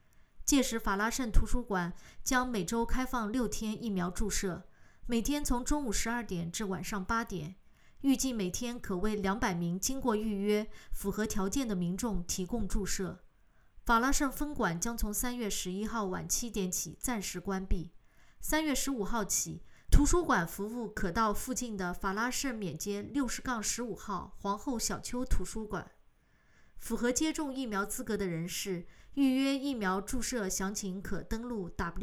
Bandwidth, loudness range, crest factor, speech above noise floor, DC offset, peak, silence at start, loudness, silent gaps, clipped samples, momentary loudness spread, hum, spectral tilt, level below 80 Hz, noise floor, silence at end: 17.5 kHz; 4 LU; 24 dB; 33 dB; under 0.1%; -8 dBFS; 0.2 s; -34 LUFS; none; under 0.1%; 9 LU; none; -4 dB/octave; -40 dBFS; -65 dBFS; 0 s